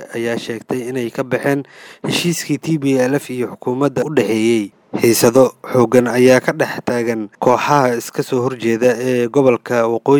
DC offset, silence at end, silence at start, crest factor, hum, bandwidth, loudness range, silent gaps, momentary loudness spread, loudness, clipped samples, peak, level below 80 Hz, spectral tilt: under 0.1%; 0 s; 0 s; 16 dB; none; over 20 kHz; 5 LU; none; 10 LU; -16 LUFS; under 0.1%; 0 dBFS; -60 dBFS; -5 dB/octave